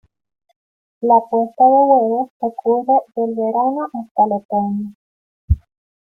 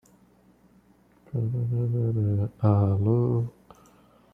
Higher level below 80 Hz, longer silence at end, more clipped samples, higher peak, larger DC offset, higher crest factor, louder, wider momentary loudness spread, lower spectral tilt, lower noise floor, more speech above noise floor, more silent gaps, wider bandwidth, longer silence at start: first, -36 dBFS vs -58 dBFS; second, 0.55 s vs 0.85 s; neither; first, -2 dBFS vs -8 dBFS; neither; about the same, 16 dB vs 20 dB; first, -17 LUFS vs -26 LUFS; first, 11 LU vs 8 LU; about the same, -12 dB/octave vs -11.5 dB/octave; first, under -90 dBFS vs -59 dBFS; first, over 74 dB vs 35 dB; first, 2.30-2.40 s, 4.11-4.15 s, 4.45-4.49 s, 4.95-5.48 s vs none; about the same, 2.4 kHz vs 2.6 kHz; second, 1 s vs 1.35 s